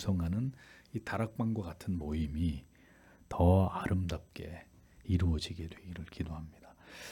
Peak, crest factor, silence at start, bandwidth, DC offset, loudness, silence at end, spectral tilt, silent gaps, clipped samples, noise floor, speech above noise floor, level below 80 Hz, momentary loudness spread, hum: -14 dBFS; 20 dB; 0 s; 14 kHz; under 0.1%; -35 LUFS; 0 s; -7.5 dB/octave; none; under 0.1%; -61 dBFS; 27 dB; -50 dBFS; 18 LU; none